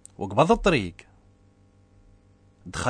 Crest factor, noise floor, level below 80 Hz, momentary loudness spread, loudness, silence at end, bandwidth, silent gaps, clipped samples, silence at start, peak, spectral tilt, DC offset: 22 dB; -58 dBFS; -44 dBFS; 17 LU; -23 LUFS; 0 s; 10.5 kHz; none; under 0.1%; 0.2 s; -4 dBFS; -5.5 dB/octave; under 0.1%